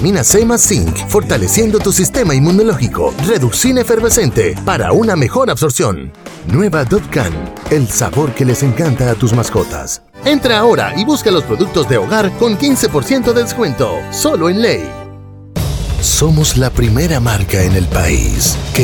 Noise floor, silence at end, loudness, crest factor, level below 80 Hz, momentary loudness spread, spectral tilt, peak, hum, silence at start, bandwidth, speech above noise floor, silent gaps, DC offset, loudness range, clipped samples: -32 dBFS; 0 s; -12 LUFS; 12 dB; -26 dBFS; 7 LU; -4.5 dB/octave; 0 dBFS; none; 0 s; over 20 kHz; 20 dB; none; under 0.1%; 3 LU; under 0.1%